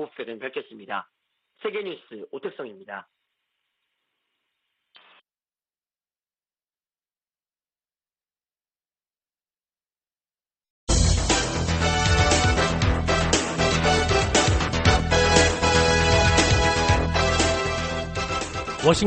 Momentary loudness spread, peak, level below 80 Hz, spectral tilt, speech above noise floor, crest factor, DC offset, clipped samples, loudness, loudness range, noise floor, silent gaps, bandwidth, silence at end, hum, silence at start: 17 LU; -4 dBFS; -32 dBFS; -4 dB/octave; over 56 dB; 20 dB; under 0.1%; under 0.1%; -21 LUFS; 18 LU; under -90 dBFS; 10.70-10.87 s; 9.4 kHz; 0 s; none; 0 s